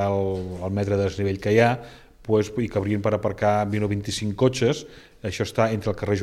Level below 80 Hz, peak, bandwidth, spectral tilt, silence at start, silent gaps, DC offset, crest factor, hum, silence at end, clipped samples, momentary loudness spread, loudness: -50 dBFS; -4 dBFS; 13 kHz; -6 dB/octave; 0 s; none; under 0.1%; 20 dB; none; 0 s; under 0.1%; 9 LU; -24 LUFS